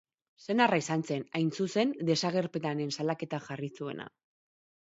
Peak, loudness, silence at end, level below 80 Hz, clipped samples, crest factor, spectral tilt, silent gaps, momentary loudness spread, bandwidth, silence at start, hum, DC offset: -10 dBFS; -31 LUFS; 0.85 s; -76 dBFS; under 0.1%; 22 dB; -5 dB/octave; none; 13 LU; 8 kHz; 0.4 s; none; under 0.1%